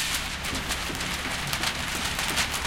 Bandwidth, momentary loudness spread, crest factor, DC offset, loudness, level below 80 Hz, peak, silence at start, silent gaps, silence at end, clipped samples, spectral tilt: 17 kHz; 4 LU; 22 dB; under 0.1%; -27 LUFS; -40 dBFS; -8 dBFS; 0 s; none; 0 s; under 0.1%; -2 dB/octave